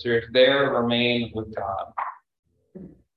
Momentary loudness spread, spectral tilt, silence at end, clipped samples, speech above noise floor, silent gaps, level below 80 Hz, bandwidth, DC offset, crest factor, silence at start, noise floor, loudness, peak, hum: 14 LU; -7.5 dB/octave; 0.3 s; under 0.1%; 22 dB; 2.39-2.43 s; -54 dBFS; 5 kHz; under 0.1%; 18 dB; 0 s; -45 dBFS; -22 LUFS; -6 dBFS; none